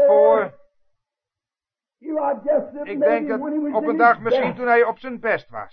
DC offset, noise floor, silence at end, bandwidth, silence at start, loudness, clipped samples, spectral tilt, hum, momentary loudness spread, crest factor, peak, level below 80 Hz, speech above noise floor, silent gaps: under 0.1%; under -90 dBFS; 0.05 s; 5.4 kHz; 0 s; -20 LUFS; under 0.1%; -8 dB/octave; none; 10 LU; 18 dB; -2 dBFS; -64 dBFS; over 70 dB; none